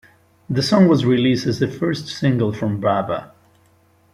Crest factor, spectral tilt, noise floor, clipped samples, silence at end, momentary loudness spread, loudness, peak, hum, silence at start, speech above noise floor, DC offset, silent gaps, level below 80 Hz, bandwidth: 16 dB; -6.5 dB/octave; -56 dBFS; under 0.1%; 0.9 s; 9 LU; -19 LUFS; -2 dBFS; none; 0.5 s; 38 dB; under 0.1%; none; -54 dBFS; 13.5 kHz